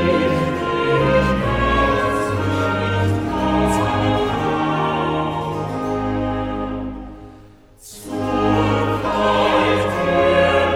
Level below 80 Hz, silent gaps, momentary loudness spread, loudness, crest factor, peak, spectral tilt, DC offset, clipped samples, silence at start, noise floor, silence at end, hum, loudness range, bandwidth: -34 dBFS; none; 9 LU; -19 LUFS; 16 dB; -2 dBFS; -6.5 dB/octave; under 0.1%; under 0.1%; 0 s; -44 dBFS; 0 s; none; 6 LU; 16 kHz